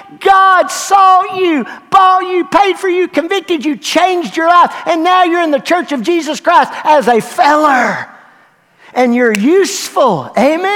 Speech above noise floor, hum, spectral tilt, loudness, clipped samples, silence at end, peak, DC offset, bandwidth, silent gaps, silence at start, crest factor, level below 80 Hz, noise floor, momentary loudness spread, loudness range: 37 dB; none; -3.5 dB/octave; -11 LUFS; 0.3%; 0 s; 0 dBFS; under 0.1%; 17 kHz; none; 0.1 s; 10 dB; -54 dBFS; -47 dBFS; 6 LU; 2 LU